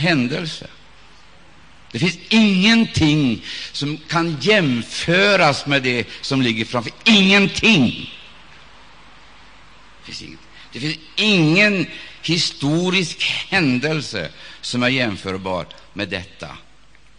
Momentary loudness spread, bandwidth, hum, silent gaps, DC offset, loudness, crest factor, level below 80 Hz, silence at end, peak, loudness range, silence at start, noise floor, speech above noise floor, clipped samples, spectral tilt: 19 LU; 10 kHz; none; none; 0.5%; -17 LUFS; 18 dB; -50 dBFS; 0.6 s; -2 dBFS; 7 LU; 0 s; -52 dBFS; 33 dB; under 0.1%; -4.5 dB/octave